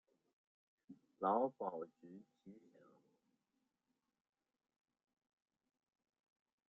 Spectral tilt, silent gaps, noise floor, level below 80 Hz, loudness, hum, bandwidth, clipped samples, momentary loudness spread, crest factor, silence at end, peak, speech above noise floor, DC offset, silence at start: -7 dB/octave; none; -89 dBFS; under -90 dBFS; -41 LUFS; none; 4.1 kHz; under 0.1%; 25 LU; 26 dB; 4.1 s; -24 dBFS; 46 dB; under 0.1%; 0.9 s